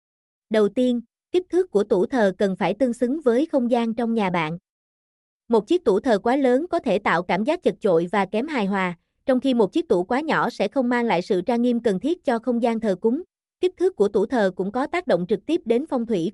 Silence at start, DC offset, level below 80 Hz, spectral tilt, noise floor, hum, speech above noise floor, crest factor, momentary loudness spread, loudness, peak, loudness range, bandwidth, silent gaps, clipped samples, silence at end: 0.5 s; under 0.1%; -60 dBFS; -6.5 dB/octave; under -90 dBFS; none; over 69 dB; 14 dB; 4 LU; -22 LUFS; -8 dBFS; 2 LU; 11.5 kHz; 4.69-5.40 s; under 0.1%; 0 s